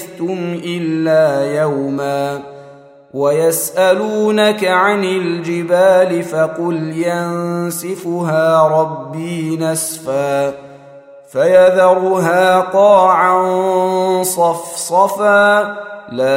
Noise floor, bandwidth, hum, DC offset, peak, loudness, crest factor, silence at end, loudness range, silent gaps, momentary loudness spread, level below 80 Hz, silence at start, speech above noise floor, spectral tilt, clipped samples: -40 dBFS; 16 kHz; none; under 0.1%; 0 dBFS; -14 LUFS; 14 dB; 0 s; 5 LU; none; 11 LU; -64 dBFS; 0 s; 26 dB; -4.5 dB/octave; under 0.1%